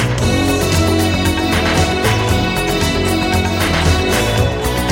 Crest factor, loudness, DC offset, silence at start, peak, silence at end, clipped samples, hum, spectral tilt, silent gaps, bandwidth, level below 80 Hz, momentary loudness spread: 12 dB; -15 LUFS; under 0.1%; 0 s; -2 dBFS; 0 s; under 0.1%; none; -4.5 dB/octave; none; 17 kHz; -26 dBFS; 2 LU